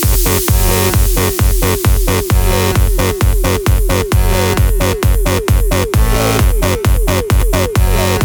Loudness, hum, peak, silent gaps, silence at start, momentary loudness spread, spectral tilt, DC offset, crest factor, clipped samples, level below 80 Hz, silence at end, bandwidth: -13 LUFS; none; 0 dBFS; none; 0 s; 2 LU; -5 dB/octave; under 0.1%; 10 dB; under 0.1%; -14 dBFS; 0 s; over 20 kHz